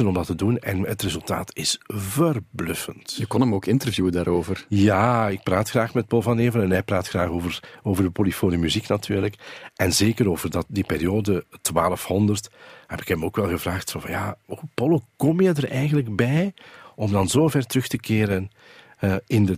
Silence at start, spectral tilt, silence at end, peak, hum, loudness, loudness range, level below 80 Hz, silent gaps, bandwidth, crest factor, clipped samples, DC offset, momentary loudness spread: 0 s; -5.5 dB/octave; 0 s; -4 dBFS; none; -23 LUFS; 3 LU; -48 dBFS; none; 15.5 kHz; 18 dB; under 0.1%; under 0.1%; 9 LU